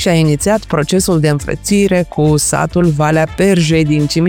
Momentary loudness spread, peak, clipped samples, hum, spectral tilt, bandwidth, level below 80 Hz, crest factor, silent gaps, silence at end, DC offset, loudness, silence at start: 3 LU; 0 dBFS; under 0.1%; none; -5.5 dB/octave; 18.5 kHz; -32 dBFS; 12 dB; none; 0 s; 0.1%; -13 LUFS; 0 s